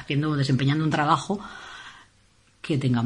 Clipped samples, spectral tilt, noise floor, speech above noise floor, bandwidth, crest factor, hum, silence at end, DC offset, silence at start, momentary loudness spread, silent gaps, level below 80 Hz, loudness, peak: under 0.1%; -6.5 dB/octave; -60 dBFS; 37 dB; 10.5 kHz; 20 dB; none; 0 s; under 0.1%; 0 s; 18 LU; none; -58 dBFS; -24 LUFS; -6 dBFS